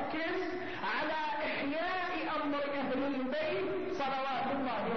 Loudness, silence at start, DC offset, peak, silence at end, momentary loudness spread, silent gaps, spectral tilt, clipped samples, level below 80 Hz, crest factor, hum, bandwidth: -35 LUFS; 0 s; 0.5%; -24 dBFS; 0 s; 1 LU; none; -2 dB/octave; under 0.1%; -66 dBFS; 12 dB; none; 6.4 kHz